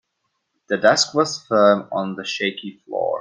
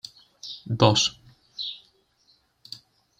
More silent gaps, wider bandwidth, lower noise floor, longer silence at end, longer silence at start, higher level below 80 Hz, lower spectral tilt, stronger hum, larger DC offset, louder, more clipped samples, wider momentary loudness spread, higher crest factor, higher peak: neither; about the same, 9.8 kHz vs 10 kHz; first, -74 dBFS vs -65 dBFS; second, 0 s vs 1.4 s; first, 0.7 s vs 0.45 s; second, -66 dBFS vs -58 dBFS; about the same, -3.5 dB/octave vs -4 dB/octave; neither; neither; first, -19 LUFS vs -23 LUFS; neither; second, 11 LU vs 24 LU; second, 20 dB vs 26 dB; about the same, 0 dBFS vs -2 dBFS